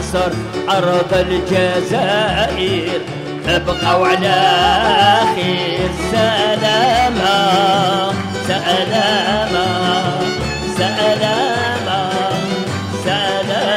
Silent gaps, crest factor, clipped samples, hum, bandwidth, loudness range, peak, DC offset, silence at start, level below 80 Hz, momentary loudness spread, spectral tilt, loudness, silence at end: none; 14 dB; under 0.1%; none; 16 kHz; 3 LU; 0 dBFS; under 0.1%; 0 s; -36 dBFS; 7 LU; -4.5 dB/octave; -15 LUFS; 0 s